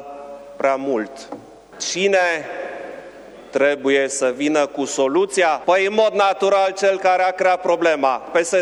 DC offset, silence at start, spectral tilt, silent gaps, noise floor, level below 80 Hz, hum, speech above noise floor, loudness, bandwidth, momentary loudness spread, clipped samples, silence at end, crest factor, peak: under 0.1%; 0 s; -3 dB/octave; none; -39 dBFS; -64 dBFS; none; 21 dB; -18 LUFS; 12 kHz; 17 LU; under 0.1%; 0 s; 16 dB; -2 dBFS